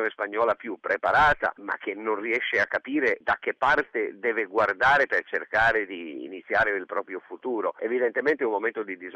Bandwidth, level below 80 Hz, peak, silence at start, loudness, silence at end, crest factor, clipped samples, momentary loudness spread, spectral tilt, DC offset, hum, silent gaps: 9 kHz; -54 dBFS; -12 dBFS; 0 s; -25 LUFS; 0 s; 14 dB; under 0.1%; 12 LU; -5 dB/octave; under 0.1%; none; none